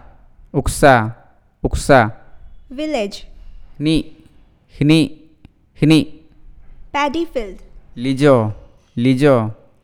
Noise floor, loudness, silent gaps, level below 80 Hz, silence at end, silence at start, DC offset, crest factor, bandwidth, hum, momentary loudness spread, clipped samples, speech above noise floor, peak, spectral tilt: -48 dBFS; -16 LUFS; none; -34 dBFS; 0.3 s; 0.55 s; under 0.1%; 18 dB; 16.5 kHz; none; 14 LU; under 0.1%; 34 dB; 0 dBFS; -6 dB/octave